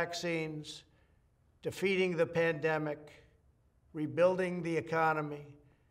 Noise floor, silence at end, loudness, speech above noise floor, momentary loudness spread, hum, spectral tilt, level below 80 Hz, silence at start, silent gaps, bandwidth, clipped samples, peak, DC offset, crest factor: -69 dBFS; 0.35 s; -33 LUFS; 35 dB; 16 LU; none; -5.5 dB/octave; -70 dBFS; 0 s; none; 15.5 kHz; under 0.1%; -16 dBFS; under 0.1%; 18 dB